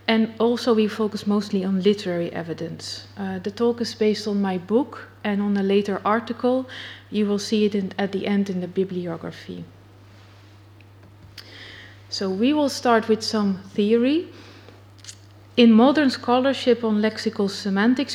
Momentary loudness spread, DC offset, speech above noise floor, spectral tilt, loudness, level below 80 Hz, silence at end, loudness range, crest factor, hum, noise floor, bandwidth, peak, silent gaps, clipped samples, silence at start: 17 LU; under 0.1%; 26 dB; -6 dB/octave; -22 LUFS; -66 dBFS; 0 s; 9 LU; 20 dB; none; -48 dBFS; 13 kHz; -2 dBFS; none; under 0.1%; 0.1 s